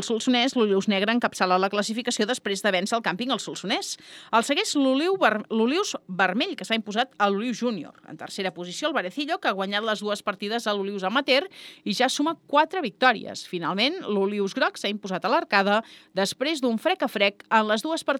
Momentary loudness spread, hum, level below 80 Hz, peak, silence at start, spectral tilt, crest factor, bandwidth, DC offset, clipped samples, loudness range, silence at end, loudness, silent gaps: 8 LU; none; -80 dBFS; -4 dBFS; 0 s; -3.5 dB/octave; 20 dB; 16.5 kHz; under 0.1%; under 0.1%; 3 LU; 0 s; -24 LUFS; none